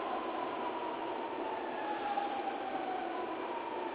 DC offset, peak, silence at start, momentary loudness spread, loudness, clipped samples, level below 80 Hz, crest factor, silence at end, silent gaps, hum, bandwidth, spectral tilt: under 0.1%; -24 dBFS; 0 s; 3 LU; -38 LUFS; under 0.1%; -76 dBFS; 14 dB; 0 s; none; none; 4 kHz; -1.5 dB/octave